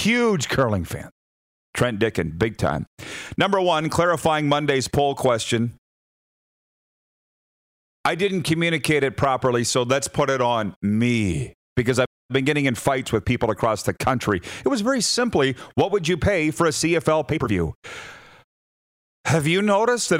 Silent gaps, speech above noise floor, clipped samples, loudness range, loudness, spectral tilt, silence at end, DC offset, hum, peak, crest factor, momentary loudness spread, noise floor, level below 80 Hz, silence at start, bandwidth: 1.12-1.73 s, 2.87-2.97 s, 5.78-8.04 s, 10.76-10.81 s, 11.54-11.76 s, 12.07-12.29 s, 17.75-17.82 s, 18.44-19.24 s; over 69 dB; under 0.1%; 4 LU; -22 LUFS; -5 dB/octave; 0 s; under 0.1%; none; -6 dBFS; 16 dB; 7 LU; under -90 dBFS; -48 dBFS; 0 s; 16 kHz